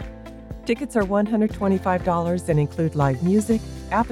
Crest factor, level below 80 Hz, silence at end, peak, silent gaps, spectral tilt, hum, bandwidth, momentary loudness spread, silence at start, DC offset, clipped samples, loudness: 14 dB; -40 dBFS; 0 s; -8 dBFS; none; -7.5 dB/octave; none; 14 kHz; 8 LU; 0 s; under 0.1%; under 0.1%; -22 LUFS